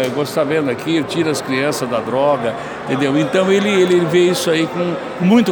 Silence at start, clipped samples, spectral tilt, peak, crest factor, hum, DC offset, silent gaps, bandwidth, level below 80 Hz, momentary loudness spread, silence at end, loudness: 0 s; under 0.1%; -5.5 dB/octave; -2 dBFS; 14 dB; none; under 0.1%; none; over 20 kHz; -56 dBFS; 7 LU; 0 s; -16 LUFS